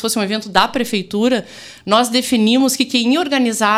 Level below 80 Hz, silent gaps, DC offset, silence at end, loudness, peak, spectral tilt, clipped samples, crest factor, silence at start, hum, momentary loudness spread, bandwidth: -52 dBFS; none; under 0.1%; 0 s; -16 LUFS; 0 dBFS; -3 dB/octave; under 0.1%; 16 dB; 0 s; none; 6 LU; 16 kHz